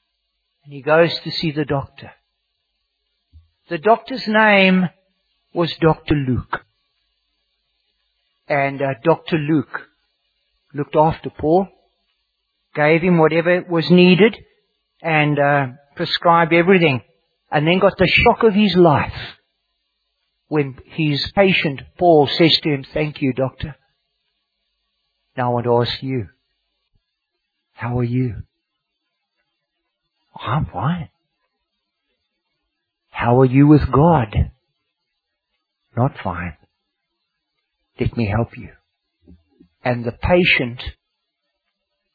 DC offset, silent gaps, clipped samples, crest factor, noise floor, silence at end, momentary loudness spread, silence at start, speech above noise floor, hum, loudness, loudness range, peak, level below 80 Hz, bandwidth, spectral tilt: under 0.1%; none; under 0.1%; 20 dB; -76 dBFS; 1.25 s; 17 LU; 0.7 s; 60 dB; none; -17 LUFS; 12 LU; 0 dBFS; -40 dBFS; 4.9 kHz; -8.5 dB/octave